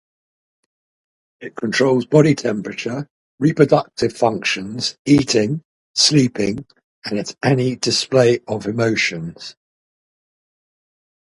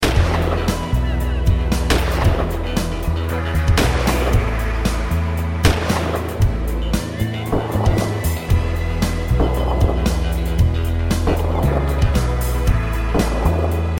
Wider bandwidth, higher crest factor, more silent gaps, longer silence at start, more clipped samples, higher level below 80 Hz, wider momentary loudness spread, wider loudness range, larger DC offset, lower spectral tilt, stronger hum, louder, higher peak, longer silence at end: second, 11.5 kHz vs 17 kHz; about the same, 20 dB vs 16 dB; first, 3.10-3.38 s, 4.99-5.05 s, 5.65-5.94 s, 6.84-7.02 s vs none; first, 1.4 s vs 0 s; neither; second, -54 dBFS vs -20 dBFS; first, 15 LU vs 4 LU; about the same, 3 LU vs 1 LU; neither; second, -4.5 dB/octave vs -6 dB/octave; neither; about the same, -18 LUFS vs -19 LUFS; about the same, 0 dBFS vs 0 dBFS; first, 1.85 s vs 0 s